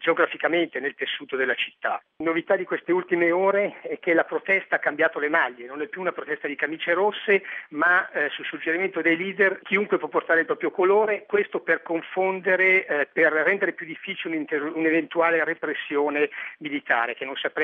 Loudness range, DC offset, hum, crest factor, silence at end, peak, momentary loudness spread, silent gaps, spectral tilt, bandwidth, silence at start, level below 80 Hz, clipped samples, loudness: 2 LU; under 0.1%; none; 18 dB; 0 s; -6 dBFS; 9 LU; none; -7 dB/octave; 4.7 kHz; 0 s; -84 dBFS; under 0.1%; -24 LUFS